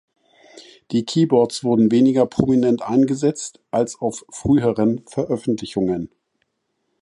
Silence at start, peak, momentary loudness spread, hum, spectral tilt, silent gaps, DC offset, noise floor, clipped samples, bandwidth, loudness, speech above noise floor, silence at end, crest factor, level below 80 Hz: 0.55 s; 0 dBFS; 10 LU; none; -6.5 dB/octave; none; under 0.1%; -73 dBFS; under 0.1%; 11.5 kHz; -19 LUFS; 54 dB; 0.95 s; 20 dB; -52 dBFS